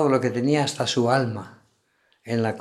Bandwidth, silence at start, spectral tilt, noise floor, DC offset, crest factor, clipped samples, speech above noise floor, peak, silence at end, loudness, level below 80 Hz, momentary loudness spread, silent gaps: 13.5 kHz; 0 s; -5.5 dB/octave; -66 dBFS; under 0.1%; 18 dB; under 0.1%; 44 dB; -6 dBFS; 0 s; -23 LUFS; -70 dBFS; 10 LU; none